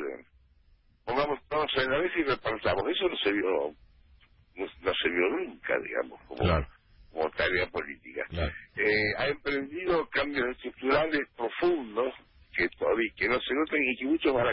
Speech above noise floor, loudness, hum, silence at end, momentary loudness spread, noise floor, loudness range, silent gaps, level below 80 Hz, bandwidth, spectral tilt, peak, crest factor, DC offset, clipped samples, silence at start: 33 dB; -29 LUFS; none; 0 s; 10 LU; -63 dBFS; 3 LU; none; -48 dBFS; 5.8 kHz; -9.5 dB/octave; -14 dBFS; 16 dB; under 0.1%; under 0.1%; 0 s